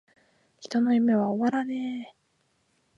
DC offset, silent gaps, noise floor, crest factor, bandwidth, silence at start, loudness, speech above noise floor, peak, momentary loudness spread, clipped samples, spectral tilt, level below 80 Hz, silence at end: under 0.1%; none; -71 dBFS; 14 dB; 7.6 kHz; 0.6 s; -26 LUFS; 46 dB; -14 dBFS; 18 LU; under 0.1%; -6.5 dB/octave; -78 dBFS; 0.9 s